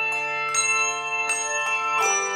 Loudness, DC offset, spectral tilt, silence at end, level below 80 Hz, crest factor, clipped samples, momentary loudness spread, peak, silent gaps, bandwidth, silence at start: -22 LUFS; under 0.1%; 1 dB/octave; 0 s; -80 dBFS; 16 dB; under 0.1%; 3 LU; -8 dBFS; none; 16.5 kHz; 0 s